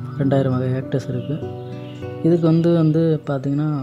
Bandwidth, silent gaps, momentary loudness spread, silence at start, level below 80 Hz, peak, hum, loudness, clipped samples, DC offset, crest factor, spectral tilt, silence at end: 7.6 kHz; none; 15 LU; 0 s; -58 dBFS; -6 dBFS; none; -19 LUFS; under 0.1%; under 0.1%; 14 dB; -9.5 dB/octave; 0 s